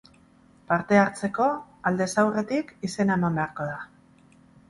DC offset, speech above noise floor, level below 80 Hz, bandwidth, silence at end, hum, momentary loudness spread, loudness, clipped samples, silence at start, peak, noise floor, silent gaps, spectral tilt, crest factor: under 0.1%; 32 dB; -60 dBFS; 11.5 kHz; 0.85 s; none; 12 LU; -25 LUFS; under 0.1%; 0.7 s; -6 dBFS; -57 dBFS; none; -6 dB/octave; 22 dB